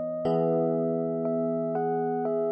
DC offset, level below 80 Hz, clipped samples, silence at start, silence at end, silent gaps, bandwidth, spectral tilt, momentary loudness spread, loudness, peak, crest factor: under 0.1%; -70 dBFS; under 0.1%; 0 s; 0 s; none; 5.6 kHz; -11 dB/octave; 3 LU; -27 LUFS; -16 dBFS; 12 dB